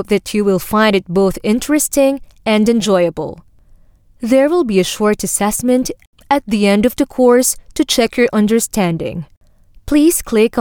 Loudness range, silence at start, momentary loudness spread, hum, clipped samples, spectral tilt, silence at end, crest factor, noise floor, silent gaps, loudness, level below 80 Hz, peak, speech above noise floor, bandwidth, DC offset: 2 LU; 0 s; 7 LU; none; under 0.1%; -4.5 dB/octave; 0 s; 14 dB; -46 dBFS; 6.07-6.13 s, 9.37-9.41 s; -14 LUFS; -40 dBFS; -2 dBFS; 32 dB; 19.5 kHz; under 0.1%